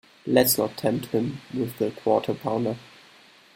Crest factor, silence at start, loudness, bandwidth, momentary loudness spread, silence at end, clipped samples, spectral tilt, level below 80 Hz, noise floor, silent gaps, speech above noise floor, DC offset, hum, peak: 22 dB; 0.25 s; -25 LUFS; 16.5 kHz; 10 LU; 0.75 s; under 0.1%; -4.5 dB/octave; -62 dBFS; -53 dBFS; none; 29 dB; under 0.1%; none; -4 dBFS